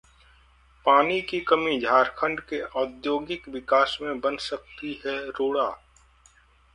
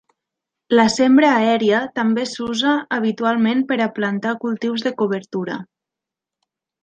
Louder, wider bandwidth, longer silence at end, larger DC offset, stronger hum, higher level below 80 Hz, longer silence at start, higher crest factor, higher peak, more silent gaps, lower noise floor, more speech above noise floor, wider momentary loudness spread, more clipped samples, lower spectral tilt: second, -25 LUFS vs -18 LUFS; first, 11 kHz vs 9.2 kHz; second, 1 s vs 1.2 s; neither; neither; about the same, -58 dBFS vs -62 dBFS; first, 0.85 s vs 0.7 s; about the same, 22 dB vs 18 dB; second, -6 dBFS vs -2 dBFS; neither; second, -58 dBFS vs -86 dBFS; second, 33 dB vs 68 dB; first, 13 LU vs 10 LU; neither; about the same, -4.5 dB/octave vs -5 dB/octave